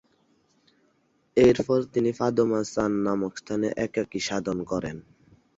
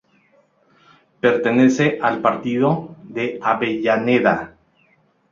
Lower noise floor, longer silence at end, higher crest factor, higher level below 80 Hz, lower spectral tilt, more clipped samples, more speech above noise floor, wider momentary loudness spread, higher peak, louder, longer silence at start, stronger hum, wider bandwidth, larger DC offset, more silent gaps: first, -68 dBFS vs -59 dBFS; second, 0.55 s vs 0.85 s; about the same, 20 dB vs 18 dB; first, -54 dBFS vs -60 dBFS; about the same, -6 dB/octave vs -6.5 dB/octave; neither; about the same, 43 dB vs 42 dB; about the same, 10 LU vs 10 LU; second, -6 dBFS vs -2 dBFS; second, -25 LUFS vs -18 LUFS; about the same, 1.35 s vs 1.25 s; neither; about the same, 8 kHz vs 7.4 kHz; neither; neither